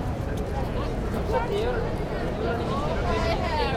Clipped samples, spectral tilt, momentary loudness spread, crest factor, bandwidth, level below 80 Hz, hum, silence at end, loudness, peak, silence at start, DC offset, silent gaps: under 0.1%; -6.5 dB/octave; 4 LU; 14 dB; 16 kHz; -32 dBFS; none; 0 s; -27 LUFS; -12 dBFS; 0 s; under 0.1%; none